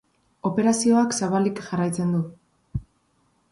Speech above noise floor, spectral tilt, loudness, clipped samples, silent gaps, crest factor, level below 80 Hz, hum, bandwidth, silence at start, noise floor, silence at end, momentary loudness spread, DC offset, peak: 44 dB; -5.5 dB/octave; -23 LUFS; under 0.1%; none; 16 dB; -50 dBFS; none; 11.5 kHz; 0.45 s; -66 dBFS; 0.7 s; 16 LU; under 0.1%; -10 dBFS